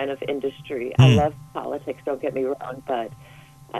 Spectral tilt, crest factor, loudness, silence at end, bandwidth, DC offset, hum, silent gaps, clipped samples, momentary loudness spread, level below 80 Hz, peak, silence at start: -7.5 dB/octave; 20 dB; -23 LUFS; 0 s; 11.5 kHz; under 0.1%; none; none; under 0.1%; 15 LU; -52 dBFS; -4 dBFS; 0 s